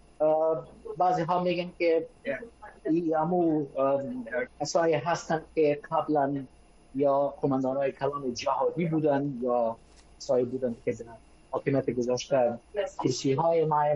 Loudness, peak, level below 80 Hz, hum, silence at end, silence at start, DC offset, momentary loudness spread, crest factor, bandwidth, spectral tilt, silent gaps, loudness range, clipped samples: -28 LUFS; -12 dBFS; -60 dBFS; none; 0 s; 0.2 s; under 0.1%; 10 LU; 16 dB; 10.5 kHz; -6 dB/octave; none; 2 LU; under 0.1%